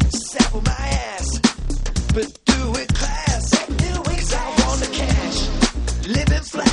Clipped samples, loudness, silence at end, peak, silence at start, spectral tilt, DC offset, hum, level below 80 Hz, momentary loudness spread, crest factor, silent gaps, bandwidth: under 0.1%; -20 LUFS; 0 s; 0 dBFS; 0 s; -4.5 dB/octave; under 0.1%; none; -24 dBFS; 4 LU; 18 dB; none; 11.5 kHz